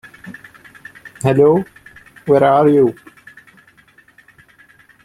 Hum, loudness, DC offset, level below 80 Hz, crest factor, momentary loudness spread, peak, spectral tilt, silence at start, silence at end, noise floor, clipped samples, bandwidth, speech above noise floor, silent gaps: none; -14 LUFS; under 0.1%; -56 dBFS; 16 dB; 26 LU; 0 dBFS; -8 dB/octave; 0.25 s; 2.1 s; -50 dBFS; under 0.1%; 12.5 kHz; 38 dB; none